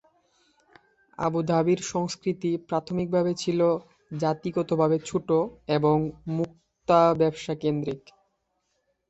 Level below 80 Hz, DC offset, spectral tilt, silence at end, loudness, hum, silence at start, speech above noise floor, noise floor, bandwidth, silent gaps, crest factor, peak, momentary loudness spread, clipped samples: -60 dBFS; under 0.1%; -6.5 dB/octave; 1.1 s; -26 LUFS; none; 1.2 s; 50 dB; -75 dBFS; 8.2 kHz; none; 20 dB; -6 dBFS; 8 LU; under 0.1%